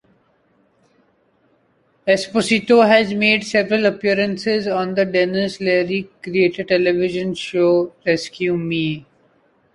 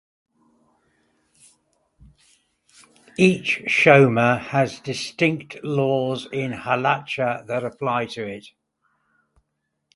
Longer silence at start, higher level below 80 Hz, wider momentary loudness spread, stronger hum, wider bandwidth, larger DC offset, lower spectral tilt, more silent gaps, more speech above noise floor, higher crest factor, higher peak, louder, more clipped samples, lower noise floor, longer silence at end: second, 2.05 s vs 3.2 s; about the same, -58 dBFS vs -62 dBFS; second, 8 LU vs 15 LU; neither; about the same, 11.5 kHz vs 11.5 kHz; neither; about the same, -5 dB/octave vs -6 dB/octave; neither; second, 43 dB vs 56 dB; second, 18 dB vs 24 dB; about the same, -2 dBFS vs 0 dBFS; first, -18 LUFS vs -21 LUFS; neither; second, -61 dBFS vs -76 dBFS; second, 0.75 s vs 1.55 s